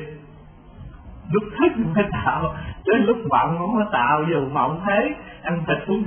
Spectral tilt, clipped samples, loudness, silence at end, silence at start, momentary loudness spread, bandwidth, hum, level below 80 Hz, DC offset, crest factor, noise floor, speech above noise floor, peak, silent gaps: -11.5 dB/octave; under 0.1%; -21 LUFS; 0 s; 0 s; 9 LU; 3.5 kHz; none; -44 dBFS; under 0.1%; 18 dB; -44 dBFS; 24 dB; -4 dBFS; none